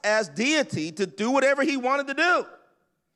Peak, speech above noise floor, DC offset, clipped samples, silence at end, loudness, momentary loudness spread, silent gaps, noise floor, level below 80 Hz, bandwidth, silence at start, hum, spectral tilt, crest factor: -10 dBFS; 45 dB; under 0.1%; under 0.1%; 0.65 s; -24 LUFS; 8 LU; none; -68 dBFS; -78 dBFS; 11.5 kHz; 0.05 s; none; -3.5 dB/octave; 14 dB